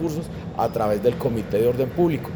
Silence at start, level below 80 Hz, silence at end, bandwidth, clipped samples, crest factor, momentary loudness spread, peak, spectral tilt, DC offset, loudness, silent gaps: 0 s; -46 dBFS; 0 s; over 20 kHz; under 0.1%; 16 dB; 7 LU; -8 dBFS; -7.5 dB/octave; under 0.1%; -23 LUFS; none